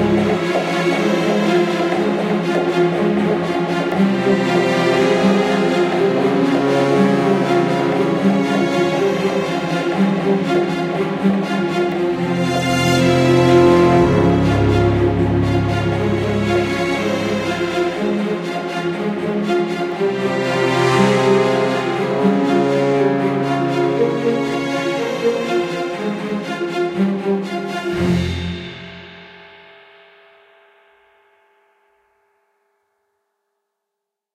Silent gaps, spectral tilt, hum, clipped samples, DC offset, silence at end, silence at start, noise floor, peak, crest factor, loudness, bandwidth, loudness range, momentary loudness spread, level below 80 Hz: none; -6.5 dB/octave; none; under 0.1%; under 0.1%; 4.9 s; 0 s; -81 dBFS; 0 dBFS; 16 dB; -17 LUFS; 13.5 kHz; 7 LU; 7 LU; -40 dBFS